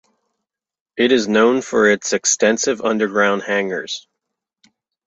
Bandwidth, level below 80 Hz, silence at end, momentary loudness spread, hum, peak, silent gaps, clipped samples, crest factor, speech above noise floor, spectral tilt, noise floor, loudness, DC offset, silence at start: 8.2 kHz; -62 dBFS; 1.05 s; 10 LU; none; -2 dBFS; none; under 0.1%; 16 dB; 63 dB; -2.5 dB/octave; -80 dBFS; -17 LUFS; under 0.1%; 0.95 s